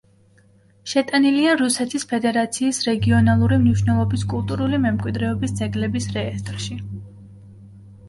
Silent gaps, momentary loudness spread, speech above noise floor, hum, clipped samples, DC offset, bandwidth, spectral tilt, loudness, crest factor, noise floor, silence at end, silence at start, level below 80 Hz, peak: none; 12 LU; 35 dB; none; under 0.1%; under 0.1%; 11.5 kHz; -5.5 dB/octave; -20 LUFS; 16 dB; -55 dBFS; 0 s; 0.85 s; -40 dBFS; -4 dBFS